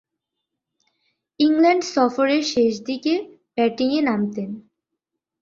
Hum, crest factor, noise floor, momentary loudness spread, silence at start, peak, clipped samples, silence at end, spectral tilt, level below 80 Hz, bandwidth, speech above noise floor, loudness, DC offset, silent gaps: none; 16 dB; -82 dBFS; 12 LU; 1.4 s; -6 dBFS; under 0.1%; 0.8 s; -4.5 dB/octave; -66 dBFS; 7.6 kHz; 62 dB; -20 LUFS; under 0.1%; none